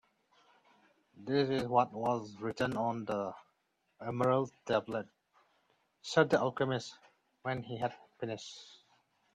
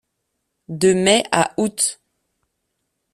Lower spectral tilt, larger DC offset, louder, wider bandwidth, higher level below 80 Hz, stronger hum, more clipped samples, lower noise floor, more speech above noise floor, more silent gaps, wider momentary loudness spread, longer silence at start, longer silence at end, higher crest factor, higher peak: first, -6 dB/octave vs -3.5 dB/octave; neither; second, -34 LUFS vs -18 LUFS; about the same, 12.5 kHz vs 13.5 kHz; second, -72 dBFS vs -58 dBFS; neither; neither; first, -79 dBFS vs -75 dBFS; second, 45 dB vs 57 dB; neither; first, 17 LU vs 6 LU; first, 1.15 s vs 0.7 s; second, 0.6 s vs 1.2 s; about the same, 22 dB vs 20 dB; second, -14 dBFS vs 0 dBFS